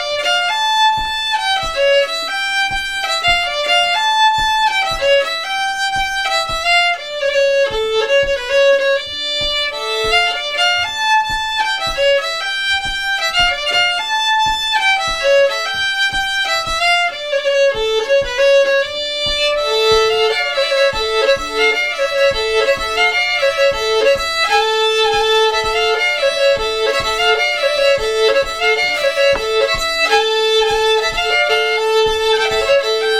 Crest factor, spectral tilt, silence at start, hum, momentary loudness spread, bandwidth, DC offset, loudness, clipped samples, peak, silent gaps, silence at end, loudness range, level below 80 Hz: 14 dB; -0.5 dB/octave; 0 s; none; 4 LU; 15.5 kHz; 0.5%; -14 LUFS; under 0.1%; 0 dBFS; none; 0 s; 1 LU; -38 dBFS